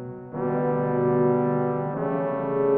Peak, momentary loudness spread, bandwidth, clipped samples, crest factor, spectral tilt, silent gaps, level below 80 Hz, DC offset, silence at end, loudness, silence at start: -10 dBFS; 6 LU; 3.5 kHz; under 0.1%; 14 dB; -9.5 dB/octave; none; -60 dBFS; under 0.1%; 0 s; -24 LUFS; 0 s